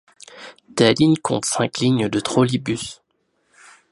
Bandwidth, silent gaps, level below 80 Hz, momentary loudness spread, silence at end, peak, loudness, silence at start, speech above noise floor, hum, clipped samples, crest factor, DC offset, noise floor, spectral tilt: 11.5 kHz; none; -56 dBFS; 19 LU; 0.95 s; 0 dBFS; -19 LUFS; 0.35 s; 49 dB; none; under 0.1%; 20 dB; under 0.1%; -68 dBFS; -5 dB/octave